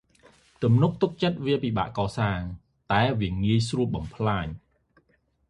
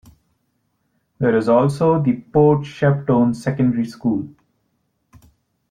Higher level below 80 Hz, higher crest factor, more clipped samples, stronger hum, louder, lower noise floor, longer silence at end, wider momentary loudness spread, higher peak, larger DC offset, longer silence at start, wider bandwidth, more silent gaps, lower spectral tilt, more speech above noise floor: first, -46 dBFS vs -54 dBFS; about the same, 18 dB vs 16 dB; neither; neither; second, -26 LUFS vs -18 LUFS; about the same, -68 dBFS vs -69 dBFS; second, 0.9 s vs 1.4 s; first, 10 LU vs 7 LU; second, -8 dBFS vs -4 dBFS; neither; second, 0.6 s vs 1.2 s; about the same, 11 kHz vs 10 kHz; neither; second, -7 dB/octave vs -8.5 dB/octave; second, 43 dB vs 52 dB